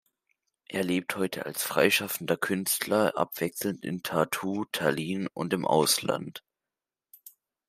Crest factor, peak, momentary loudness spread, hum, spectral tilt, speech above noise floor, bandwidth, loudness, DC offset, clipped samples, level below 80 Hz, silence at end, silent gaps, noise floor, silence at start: 24 dB; -6 dBFS; 9 LU; none; -3.5 dB/octave; over 62 dB; 16 kHz; -28 LUFS; under 0.1%; under 0.1%; -72 dBFS; 0.4 s; none; under -90 dBFS; 0.7 s